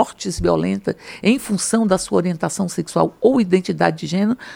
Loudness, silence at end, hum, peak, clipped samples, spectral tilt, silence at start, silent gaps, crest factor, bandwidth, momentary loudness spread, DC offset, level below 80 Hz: -19 LUFS; 0 s; none; -2 dBFS; under 0.1%; -5.5 dB/octave; 0 s; none; 18 dB; 17 kHz; 5 LU; under 0.1%; -44 dBFS